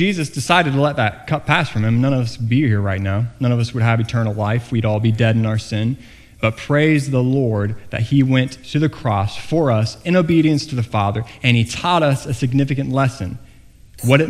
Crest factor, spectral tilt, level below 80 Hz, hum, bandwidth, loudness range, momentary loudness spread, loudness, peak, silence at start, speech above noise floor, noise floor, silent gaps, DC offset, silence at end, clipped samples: 18 dB; -6.5 dB/octave; -44 dBFS; none; 14 kHz; 1 LU; 7 LU; -18 LUFS; 0 dBFS; 0 s; 27 dB; -44 dBFS; none; under 0.1%; 0 s; under 0.1%